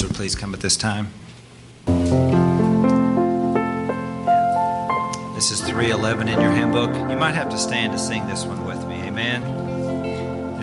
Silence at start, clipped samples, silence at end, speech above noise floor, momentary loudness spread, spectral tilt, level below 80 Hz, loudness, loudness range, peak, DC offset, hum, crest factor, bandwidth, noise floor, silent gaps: 0 s; under 0.1%; 0 s; 22 dB; 10 LU; -5 dB/octave; -46 dBFS; -21 LUFS; 4 LU; -4 dBFS; under 0.1%; none; 16 dB; 11.5 kHz; -43 dBFS; none